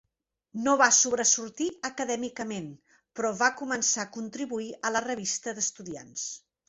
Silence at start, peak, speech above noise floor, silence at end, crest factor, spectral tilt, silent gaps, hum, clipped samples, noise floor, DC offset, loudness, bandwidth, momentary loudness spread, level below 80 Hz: 0.55 s; -6 dBFS; 52 dB; 0.3 s; 24 dB; -1.5 dB/octave; none; none; under 0.1%; -81 dBFS; under 0.1%; -27 LUFS; 8.4 kHz; 16 LU; -70 dBFS